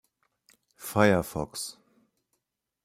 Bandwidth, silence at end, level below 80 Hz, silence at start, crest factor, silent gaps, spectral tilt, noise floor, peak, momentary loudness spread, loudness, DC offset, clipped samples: 16 kHz; 1.15 s; -58 dBFS; 0.8 s; 24 dB; none; -5 dB/octave; -82 dBFS; -6 dBFS; 16 LU; -27 LUFS; under 0.1%; under 0.1%